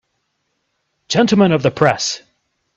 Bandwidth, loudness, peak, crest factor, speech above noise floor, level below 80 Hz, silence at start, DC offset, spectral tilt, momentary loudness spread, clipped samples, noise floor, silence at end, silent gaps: 8 kHz; -15 LUFS; 0 dBFS; 18 dB; 56 dB; -54 dBFS; 1.1 s; under 0.1%; -5 dB/octave; 9 LU; under 0.1%; -70 dBFS; 0.6 s; none